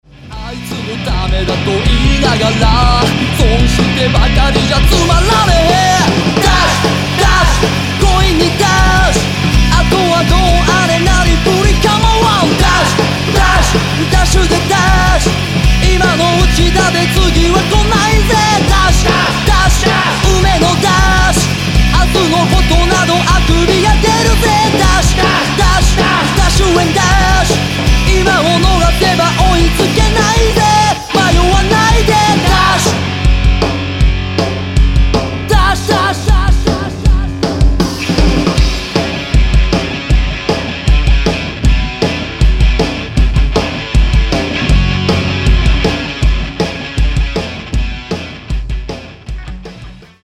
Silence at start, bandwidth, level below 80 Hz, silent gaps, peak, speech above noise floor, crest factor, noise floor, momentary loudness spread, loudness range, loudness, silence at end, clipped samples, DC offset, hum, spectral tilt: 0.25 s; 15.5 kHz; -14 dBFS; none; 0 dBFS; 23 dB; 10 dB; -32 dBFS; 6 LU; 4 LU; -11 LUFS; 0.25 s; under 0.1%; under 0.1%; none; -4.5 dB/octave